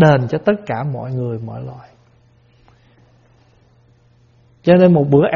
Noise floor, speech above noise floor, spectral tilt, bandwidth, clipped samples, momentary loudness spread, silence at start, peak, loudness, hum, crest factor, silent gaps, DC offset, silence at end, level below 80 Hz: -52 dBFS; 38 dB; -7.5 dB/octave; 7 kHz; under 0.1%; 18 LU; 0 s; 0 dBFS; -16 LUFS; none; 18 dB; none; under 0.1%; 0 s; -52 dBFS